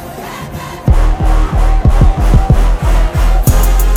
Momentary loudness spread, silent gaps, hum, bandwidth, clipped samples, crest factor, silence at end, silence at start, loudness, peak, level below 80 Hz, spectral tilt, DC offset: 13 LU; none; none; 17.5 kHz; under 0.1%; 8 dB; 0 s; 0 s; -13 LUFS; 0 dBFS; -10 dBFS; -6 dB/octave; under 0.1%